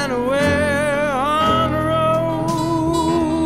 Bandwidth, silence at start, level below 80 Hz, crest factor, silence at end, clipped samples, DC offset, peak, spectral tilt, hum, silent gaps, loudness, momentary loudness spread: 15.5 kHz; 0 s; -38 dBFS; 12 dB; 0 s; under 0.1%; 0.5%; -6 dBFS; -5.5 dB/octave; none; none; -18 LUFS; 3 LU